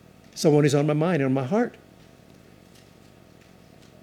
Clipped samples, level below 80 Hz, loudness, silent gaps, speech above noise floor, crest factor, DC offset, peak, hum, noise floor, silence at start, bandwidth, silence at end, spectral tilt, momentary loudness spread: under 0.1%; -66 dBFS; -22 LUFS; none; 30 dB; 18 dB; under 0.1%; -8 dBFS; none; -52 dBFS; 0.35 s; 14 kHz; 2.3 s; -6.5 dB/octave; 8 LU